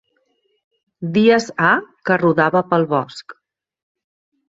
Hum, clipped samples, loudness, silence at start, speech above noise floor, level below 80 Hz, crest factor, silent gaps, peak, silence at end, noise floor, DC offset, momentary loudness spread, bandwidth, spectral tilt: none; under 0.1%; -16 LUFS; 1 s; 49 dB; -62 dBFS; 18 dB; none; -2 dBFS; 1.15 s; -66 dBFS; under 0.1%; 13 LU; 8 kHz; -6 dB/octave